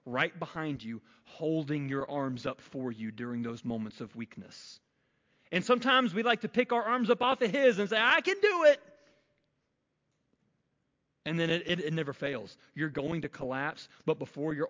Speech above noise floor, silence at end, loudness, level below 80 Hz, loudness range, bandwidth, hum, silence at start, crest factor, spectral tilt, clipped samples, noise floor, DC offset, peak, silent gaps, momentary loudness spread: 49 dB; 0 s; -30 LUFS; -70 dBFS; 10 LU; 7.6 kHz; none; 0.05 s; 20 dB; -5.5 dB/octave; under 0.1%; -80 dBFS; under 0.1%; -12 dBFS; none; 17 LU